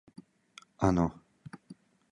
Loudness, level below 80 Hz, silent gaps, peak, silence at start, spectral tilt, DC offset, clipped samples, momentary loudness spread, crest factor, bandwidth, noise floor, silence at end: -30 LUFS; -50 dBFS; none; -10 dBFS; 0.8 s; -7.5 dB/octave; under 0.1%; under 0.1%; 25 LU; 24 dB; 11.5 kHz; -58 dBFS; 0.4 s